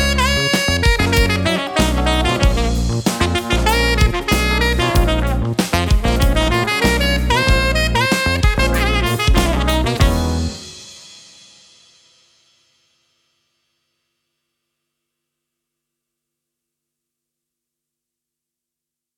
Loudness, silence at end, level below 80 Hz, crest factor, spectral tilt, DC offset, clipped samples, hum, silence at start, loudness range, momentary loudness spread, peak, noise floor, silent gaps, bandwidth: -16 LUFS; 8 s; -22 dBFS; 18 dB; -4.5 dB/octave; under 0.1%; under 0.1%; none; 0 s; 6 LU; 4 LU; 0 dBFS; -85 dBFS; none; 19 kHz